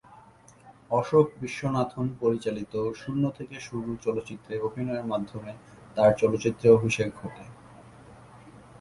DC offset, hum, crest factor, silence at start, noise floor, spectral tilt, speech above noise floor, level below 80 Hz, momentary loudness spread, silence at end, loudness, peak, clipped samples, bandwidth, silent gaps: under 0.1%; none; 22 dB; 0.65 s; -54 dBFS; -6.5 dB/octave; 27 dB; -58 dBFS; 18 LU; 0.2 s; -27 LUFS; -6 dBFS; under 0.1%; 11.5 kHz; none